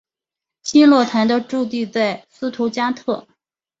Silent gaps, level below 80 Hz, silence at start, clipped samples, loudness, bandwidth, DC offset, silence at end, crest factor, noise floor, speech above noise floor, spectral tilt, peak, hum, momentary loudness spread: none; -62 dBFS; 0.65 s; under 0.1%; -18 LUFS; 8 kHz; under 0.1%; 0.6 s; 16 dB; -87 dBFS; 70 dB; -4.5 dB/octave; -2 dBFS; none; 15 LU